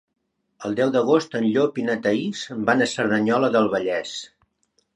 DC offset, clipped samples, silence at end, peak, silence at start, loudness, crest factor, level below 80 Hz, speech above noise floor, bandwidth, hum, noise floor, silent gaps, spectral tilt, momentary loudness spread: under 0.1%; under 0.1%; 0.7 s; -4 dBFS; 0.6 s; -21 LUFS; 18 dB; -66 dBFS; 48 dB; 10.5 kHz; none; -69 dBFS; none; -5 dB/octave; 9 LU